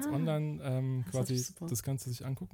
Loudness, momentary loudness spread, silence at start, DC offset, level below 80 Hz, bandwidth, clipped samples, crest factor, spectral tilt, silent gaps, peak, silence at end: -35 LUFS; 5 LU; 0 s; under 0.1%; -64 dBFS; 18 kHz; under 0.1%; 14 dB; -6 dB/octave; none; -22 dBFS; 0.05 s